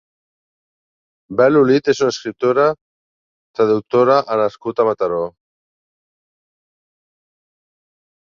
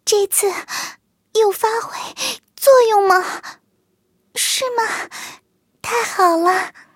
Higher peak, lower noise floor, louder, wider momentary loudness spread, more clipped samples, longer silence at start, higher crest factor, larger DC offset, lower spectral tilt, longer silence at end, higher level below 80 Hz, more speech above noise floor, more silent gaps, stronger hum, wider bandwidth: about the same, -2 dBFS vs -2 dBFS; first, under -90 dBFS vs -65 dBFS; about the same, -16 LUFS vs -17 LUFS; second, 11 LU vs 17 LU; neither; first, 1.3 s vs 0.05 s; about the same, 18 dB vs 18 dB; neither; first, -6 dB/octave vs -0.5 dB/octave; first, 3.05 s vs 0.25 s; first, -62 dBFS vs -68 dBFS; first, over 75 dB vs 48 dB; first, 2.81-3.54 s vs none; neither; second, 7.4 kHz vs 17 kHz